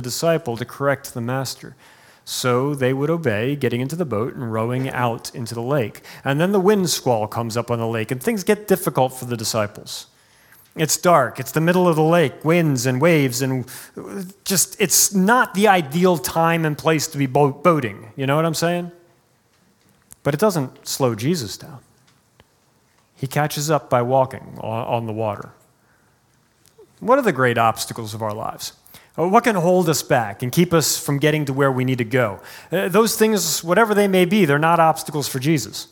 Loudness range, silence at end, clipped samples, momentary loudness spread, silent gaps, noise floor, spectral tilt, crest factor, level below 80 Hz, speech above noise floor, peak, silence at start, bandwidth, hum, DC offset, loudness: 6 LU; 0.05 s; under 0.1%; 12 LU; none; -60 dBFS; -4.5 dB/octave; 20 dB; -60 dBFS; 40 dB; 0 dBFS; 0 s; 18 kHz; none; under 0.1%; -19 LUFS